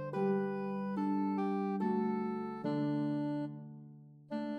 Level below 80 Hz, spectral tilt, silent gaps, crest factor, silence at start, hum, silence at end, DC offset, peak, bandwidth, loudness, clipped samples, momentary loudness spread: under -90 dBFS; -9.5 dB/octave; none; 12 dB; 0 s; none; 0 s; under 0.1%; -22 dBFS; 5.6 kHz; -36 LUFS; under 0.1%; 10 LU